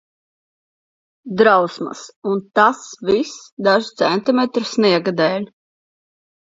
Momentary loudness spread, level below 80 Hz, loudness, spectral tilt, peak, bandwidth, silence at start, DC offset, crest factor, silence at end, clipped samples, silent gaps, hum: 14 LU; -64 dBFS; -17 LUFS; -5 dB/octave; 0 dBFS; 7.8 kHz; 1.25 s; under 0.1%; 18 dB; 1 s; under 0.1%; 2.16-2.22 s, 3.52-3.57 s; none